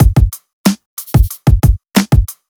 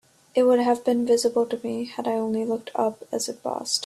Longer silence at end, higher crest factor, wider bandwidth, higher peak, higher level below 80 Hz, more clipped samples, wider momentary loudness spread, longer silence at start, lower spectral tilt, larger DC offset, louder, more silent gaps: first, 0.25 s vs 0 s; about the same, 12 dB vs 16 dB; first, over 20 kHz vs 13 kHz; first, 0 dBFS vs -8 dBFS; first, -16 dBFS vs -70 dBFS; neither; second, 5 LU vs 9 LU; second, 0 s vs 0.35 s; first, -6 dB/octave vs -3.5 dB/octave; neither; first, -14 LUFS vs -24 LUFS; first, 0.53-0.64 s, 0.86-0.97 s vs none